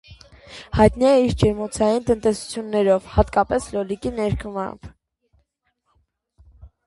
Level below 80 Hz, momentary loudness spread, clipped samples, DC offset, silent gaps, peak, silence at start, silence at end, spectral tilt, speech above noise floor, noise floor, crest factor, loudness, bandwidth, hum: -36 dBFS; 13 LU; under 0.1%; under 0.1%; none; -2 dBFS; 0.1 s; 0.2 s; -6.5 dB/octave; 51 dB; -71 dBFS; 20 dB; -20 LUFS; 11.5 kHz; none